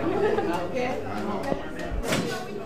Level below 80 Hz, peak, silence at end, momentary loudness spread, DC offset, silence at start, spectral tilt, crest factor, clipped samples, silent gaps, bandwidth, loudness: -42 dBFS; -10 dBFS; 0 s; 7 LU; 1%; 0 s; -5 dB/octave; 18 dB; under 0.1%; none; 15.5 kHz; -28 LUFS